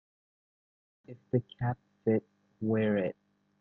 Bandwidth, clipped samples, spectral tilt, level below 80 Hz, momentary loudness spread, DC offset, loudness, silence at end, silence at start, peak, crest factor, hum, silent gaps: 3.9 kHz; under 0.1%; -11 dB/octave; -68 dBFS; 21 LU; under 0.1%; -33 LUFS; 0.5 s; 1.1 s; -16 dBFS; 18 dB; none; none